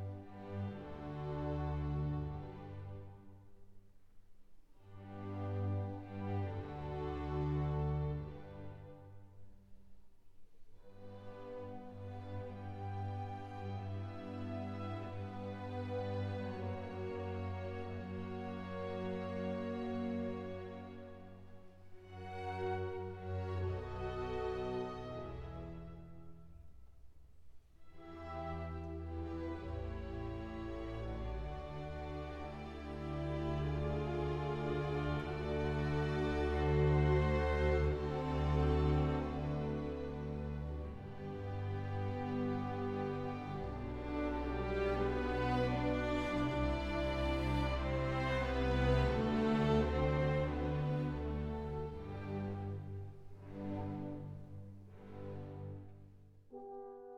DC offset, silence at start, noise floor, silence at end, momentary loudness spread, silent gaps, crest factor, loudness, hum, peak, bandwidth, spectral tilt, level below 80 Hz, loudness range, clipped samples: under 0.1%; 0 s; -59 dBFS; 0 s; 17 LU; none; 18 dB; -40 LUFS; none; -20 dBFS; 8.6 kHz; -8 dB/octave; -46 dBFS; 13 LU; under 0.1%